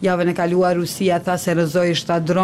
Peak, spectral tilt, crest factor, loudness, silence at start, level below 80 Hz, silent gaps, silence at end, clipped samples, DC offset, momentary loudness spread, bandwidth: -8 dBFS; -5.5 dB/octave; 10 dB; -19 LUFS; 0 s; -54 dBFS; none; 0 s; under 0.1%; under 0.1%; 2 LU; 16 kHz